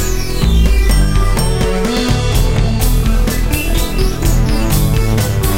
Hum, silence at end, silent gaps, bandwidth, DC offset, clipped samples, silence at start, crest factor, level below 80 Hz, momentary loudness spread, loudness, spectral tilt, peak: none; 0 s; none; 16.5 kHz; 5%; under 0.1%; 0 s; 12 dB; -14 dBFS; 3 LU; -15 LUFS; -5 dB/octave; 0 dBFS